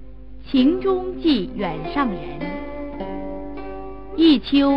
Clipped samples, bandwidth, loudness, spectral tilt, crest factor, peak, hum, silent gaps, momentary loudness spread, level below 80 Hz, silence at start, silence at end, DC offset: under 0.1%; 5.6 kHz; -21 LUFS; -8 dB/octave; 18 dB; -4 dBFS; none; none; 16 LU; -40 dBFS; 0 s; 0 s; 1%